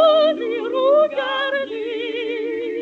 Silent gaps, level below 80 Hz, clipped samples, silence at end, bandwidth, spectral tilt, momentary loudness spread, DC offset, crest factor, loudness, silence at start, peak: none; -84 dBFS; under 0.1%; 0 s; 6.8 kHz; -4 dB/octave; 9 LU; under 0.1%; 14 dB; -20 LUFS; 0 s; -4 dBFS